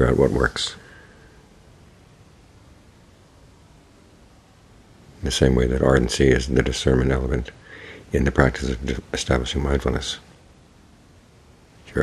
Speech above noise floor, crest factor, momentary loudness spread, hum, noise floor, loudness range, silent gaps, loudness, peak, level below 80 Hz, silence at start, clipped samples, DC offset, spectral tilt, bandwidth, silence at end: 31 dB; 24 dB; 14 LU; none; -51 dBFS; 7 LU; none; -21 LUFS; 0 dBFS; -32 dBFS; 0 s; under 0.1%; under 0.1%; -5.5 dB/octave; 12.5 kHz; 0 s